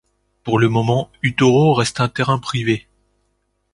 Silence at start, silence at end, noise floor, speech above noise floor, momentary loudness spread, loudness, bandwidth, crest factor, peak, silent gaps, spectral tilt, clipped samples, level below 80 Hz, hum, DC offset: 0.45 s; 0.95 s; -68 dBFS; 51 dB; 8 LU; -17 LUFS; 11.5 kHz; 16 dB; -2 dBFS; none; -6 dB/octave; under 0.1%; -50 dBFS; 50 Hz at -50 dBFS; under 0.1%